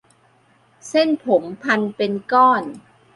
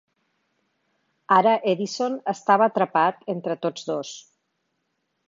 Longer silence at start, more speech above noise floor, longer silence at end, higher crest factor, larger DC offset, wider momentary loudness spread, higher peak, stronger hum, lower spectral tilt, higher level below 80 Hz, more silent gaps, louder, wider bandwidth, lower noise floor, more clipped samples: second, 0.85 s vs 1.3 s; second, 39 dB vs 53 dB; second, 0.35 s vs 1.1 s; about the same, 18 dB vs 20 dB; neither; second, 8 LU vs 12 LU; about the same, -2 dBFS vs -4 dBFS; neither; about the same, -5 dB/octave vs -5 dB/octave; first, -68 dBFS vs -78 dBFS; neither; first, -18 LUFS vs -22 LUFS; first, 11.5 kHz vs 7.6 kHz; second, -57 dBFS vs -75 dBFS; neither